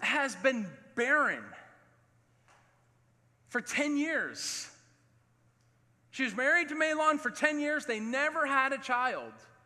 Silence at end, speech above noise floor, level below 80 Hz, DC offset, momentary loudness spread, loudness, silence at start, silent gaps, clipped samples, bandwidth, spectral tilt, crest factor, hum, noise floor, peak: 0.2 s; 37 dB; -84 dBFS; under 0.1%; 12 LU; -30 LUFS; 0 s; none; under 0.1%; 14 kHz; -2.5 dB/octave; 22 dB; none; -68 dBFS; -10 dBFS